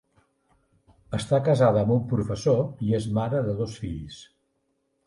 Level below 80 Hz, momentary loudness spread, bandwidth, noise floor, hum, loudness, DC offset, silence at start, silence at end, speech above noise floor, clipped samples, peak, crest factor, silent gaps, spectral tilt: -50 dBFS; 14 LU; 11.5 kHz; -73 dBFS; none; -25 LUFS; under 0.1%; 1.1 s; 0.85 s; 49 dB; under 0.1%; -8 dBFS; 18 dB; none; -7.5 dB/octave